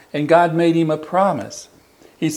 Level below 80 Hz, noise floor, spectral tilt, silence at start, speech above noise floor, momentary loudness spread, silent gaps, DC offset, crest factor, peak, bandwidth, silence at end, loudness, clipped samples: -66 dBFS; -36 dBFS; -6 dB/octave; 0.15 s; 20 dB; 15 LU; none; under 0.1%; 18 dB; 0 dBFS; 12 kHz; 0 s; -17 LUFS; under 0.1%